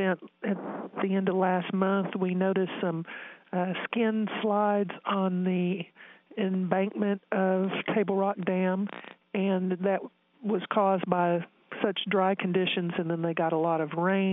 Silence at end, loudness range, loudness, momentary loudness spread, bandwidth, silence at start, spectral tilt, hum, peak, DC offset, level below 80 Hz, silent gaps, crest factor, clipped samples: 0 s; 1 LU; -29 LUFS; 8 LU; 3.9 kHz; 0 s; -10.5 dB/octave; none; -8 dBFS; under 0.1%; -80 dBFS; none; 20 dB; under 0.1%